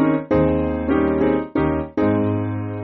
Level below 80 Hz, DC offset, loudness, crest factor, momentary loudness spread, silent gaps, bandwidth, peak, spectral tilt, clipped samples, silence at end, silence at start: -36 dBFS; under 0.1%; -20 LUFS; 12 dB; 4 LU; none; 4.4 kHz; -6 dBFS; -8 dB/octave; under 0.1%; 0 s; 0 s